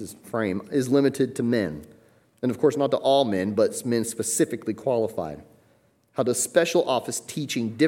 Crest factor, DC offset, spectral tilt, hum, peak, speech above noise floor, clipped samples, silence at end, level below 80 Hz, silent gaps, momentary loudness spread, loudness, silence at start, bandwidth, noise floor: 18 dB; under 0.1%; -4.5 dB/octave; none; -6 dBFS; 38 dB; under 0.1%; 0 s; -64 dBFS; none; 10 LU; -24 LUFS; 0 s; 17 kHz; -62 dBFS